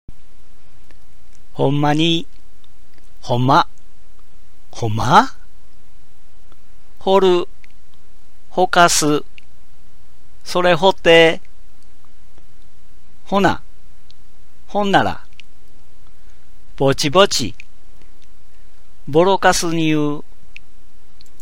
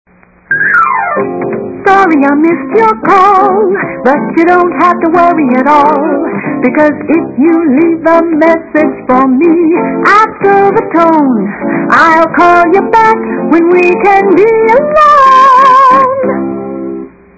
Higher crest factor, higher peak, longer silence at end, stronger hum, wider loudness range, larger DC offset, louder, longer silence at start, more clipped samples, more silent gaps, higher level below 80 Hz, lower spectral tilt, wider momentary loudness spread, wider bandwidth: first, 20 dB vs 8 dB; about the same, 0 dBFS vs 0 dBFS; first, 1.2 s vs 0.3 s; neither; about the same, 5 LU vs 3 LU; first, 9% vs under 0.1%; second, -16 LUFS vs -7 LUFS; first, 1.55 s vs 0.5 s; second, under 0.1% vs 3%; neither; about the same, -44 dBFS vs -46 dBFS; second, -4 dB/octave vs -6.5 dB/octave; first, 17 LU vs 9 LU; first, 16 kHz vs 8 kHz